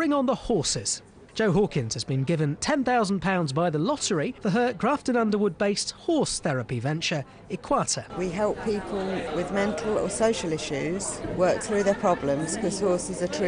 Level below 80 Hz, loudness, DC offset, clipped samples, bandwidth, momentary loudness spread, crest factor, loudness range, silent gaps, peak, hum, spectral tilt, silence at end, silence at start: -50 dBFS; -26 LUFS; under 0.1%; under 0.1%; 10 kHz; 6 LU; 16 dB; 3 LU; none; -10 dBFS; none; -4.5 dB/octave; 0 s; 0 s